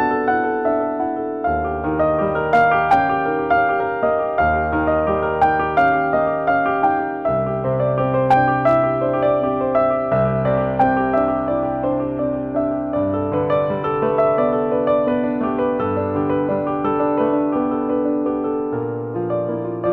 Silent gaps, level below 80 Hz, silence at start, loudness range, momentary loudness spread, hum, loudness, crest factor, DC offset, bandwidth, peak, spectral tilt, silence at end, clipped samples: none; -42 dBFS; 0 s; 2 LU; 6 LU; none; -19 LUFS; 12 dB; under 0.1%; 5.8 kHz; -6 dBFS; -9.5 dB/octave; 0 s; under 0.1%